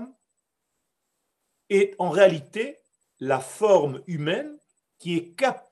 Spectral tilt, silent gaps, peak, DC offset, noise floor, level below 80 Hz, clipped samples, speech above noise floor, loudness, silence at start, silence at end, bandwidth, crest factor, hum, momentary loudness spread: -5.5 dB/octave; none; -4 dBFS; under 0.1%; -80 dBFS; -80 dBFS; under 0.1%; 57 dB; -24 LUFS; 0 s; 0.1 s; 12.5 kHz; 22 dB; none; 15 LU